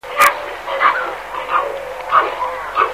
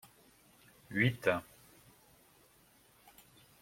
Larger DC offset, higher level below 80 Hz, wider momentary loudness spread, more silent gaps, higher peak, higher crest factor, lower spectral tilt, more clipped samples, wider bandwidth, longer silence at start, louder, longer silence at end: first, 0.3% vs under 0.1%; first, -50 dBFS vs -72 dBFS; second, 11 LU vs 28 LU; neither; first, 0 dBFS vs -14 dBFS; second, 18 dB vs 26 dB; second, -1 dB/octave vs -6 dB/octave; neither; about the same, 16 kHz vs 16.5 kHz; second, 0.05 s vs 0.9 s; first, -17 LUFS vs -34 LUFS; second, 0 s vs 2.2 s